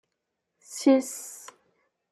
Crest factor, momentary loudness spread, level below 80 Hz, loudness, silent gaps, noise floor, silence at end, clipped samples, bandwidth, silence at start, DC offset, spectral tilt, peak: 20 dB; 19 LU; -84 dBFS; -24 LUFS; none; -82 dBFS; 0.75 s; under 0.1%; 13.5 kHz; 0.7 s; under 0.1%; -3 dB/octave; -10 dBFS